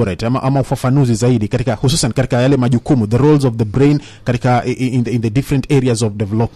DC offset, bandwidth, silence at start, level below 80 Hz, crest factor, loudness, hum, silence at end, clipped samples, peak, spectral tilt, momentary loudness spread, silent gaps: under 0.1%; 13 kHz; 0 s; -36 dBFS; 14 dB; -15 LUFS; none; 0.1 s; under 0.1%; 0 dBFS; -6.5 dB/octave; 5 LU; none